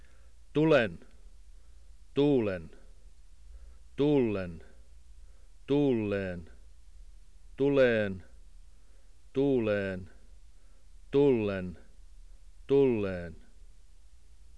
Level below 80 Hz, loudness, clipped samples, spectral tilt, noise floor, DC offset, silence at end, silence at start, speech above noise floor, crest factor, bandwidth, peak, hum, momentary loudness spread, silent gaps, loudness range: -54 dBFS; -29 LUFS; under 0.1%; -8 dB/octave; -58 dBFS; 0.3%; 0.9 s; 0.55 s; 30 dB; 18 dB; 10.5 kHz; -14 dBFS; none; 17 LU; none; 4 LU